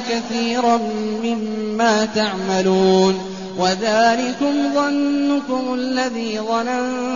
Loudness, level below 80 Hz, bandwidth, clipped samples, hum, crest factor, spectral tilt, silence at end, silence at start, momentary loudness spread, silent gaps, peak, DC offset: -19 LUFS; -56 dBFS; 7.4 kHz; under 0.1%; none; 14 dB; -3.5 dB/octave; 0 s; 0 s; 7 LU; none; -4 dBFS; 0.4%